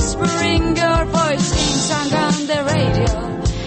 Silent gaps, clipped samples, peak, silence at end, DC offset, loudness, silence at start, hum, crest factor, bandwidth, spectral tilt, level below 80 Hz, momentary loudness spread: none; under 0.1%; -4 dBFS; 0 s; under 0.1%; -17 LUFS; 0 s; none; 12 dB; 8.8 kHz; -4.5 dB/octave; -26 dBFS; 3 LU